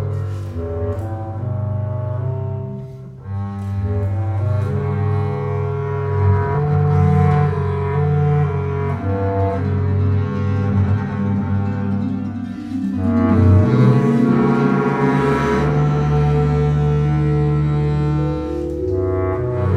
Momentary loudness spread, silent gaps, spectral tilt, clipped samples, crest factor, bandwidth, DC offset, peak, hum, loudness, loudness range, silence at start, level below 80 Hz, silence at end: 10 LU; none; -9.5 dB/octave; under 0.1%; 16 dB; 6.4 kHz; under 0.1%; -2 dBFS; none; -18 LUFS; 8 LU; 0 s; -34 dBFS; 0 s